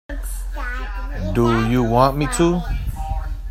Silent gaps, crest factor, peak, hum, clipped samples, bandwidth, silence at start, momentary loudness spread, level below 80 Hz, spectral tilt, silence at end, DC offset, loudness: none; 20 dB; 0 dBFS; none; under 0.1%; 16 kHz; 0.1 s; 13 LU; -26 dBFS; -6 dB/octave; 0 s; under 0.1%; -21 LUFS